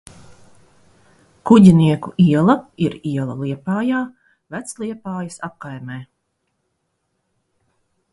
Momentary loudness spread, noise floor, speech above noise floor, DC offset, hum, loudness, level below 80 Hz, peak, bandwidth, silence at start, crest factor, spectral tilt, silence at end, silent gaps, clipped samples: 21 LU; -72 dBFS; 55 dB; under 0.1%; none; -16 LUFS; -52 dBFS; 0 dBFS; 11.5 kHz; 1.45 s; 20 dB; -7.5 dB/octave; 2.1 s; none; under 0.1%